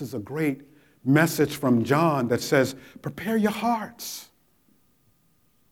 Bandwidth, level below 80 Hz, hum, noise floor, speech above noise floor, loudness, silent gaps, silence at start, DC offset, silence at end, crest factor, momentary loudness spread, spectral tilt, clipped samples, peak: 18 kHz; -64 dBFS; none; -66 dBFS; 42 dB; -24 LUFS; none; 0 s; under 0.1%; 1.5 s; 20 dB; 14 LU; -5.5 dB/octave; under 0.1%; -6 dBFS